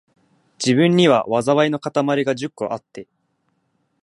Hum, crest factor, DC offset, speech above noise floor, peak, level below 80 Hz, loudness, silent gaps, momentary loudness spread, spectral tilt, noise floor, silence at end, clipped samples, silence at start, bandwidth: none; 18 dB; under 0.1%; 51 dB; -2 dBFS; -64 dBFS; -18 LUFS; none; 14 LU; -5.5 dB/octave; -68 dBFS; 1 s; under 0.1%; 0.6 s; 11.5 kHz